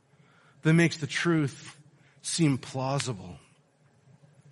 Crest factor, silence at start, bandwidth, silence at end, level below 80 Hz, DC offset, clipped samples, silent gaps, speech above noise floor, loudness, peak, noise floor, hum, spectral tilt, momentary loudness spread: 22 dB; 0.65 s; 11.5 kHz; 1.15 s; -68 dBFS; under 0.1%; under 0.1%; none; 37 dB; -28 LUFS; -8 dBFS; -64 dBFS; none; -5 dB/octave; 19 LU